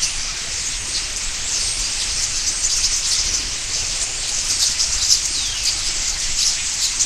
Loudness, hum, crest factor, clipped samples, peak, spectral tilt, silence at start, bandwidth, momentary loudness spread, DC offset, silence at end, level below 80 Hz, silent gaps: -18 LUFS; none; 20 dB; under 0.1%; 0 dBFS; 1.5 dB/octave; 0 s; 16 kHz; 6 LU; under 0.1%; 0 s; -34 dBFS; none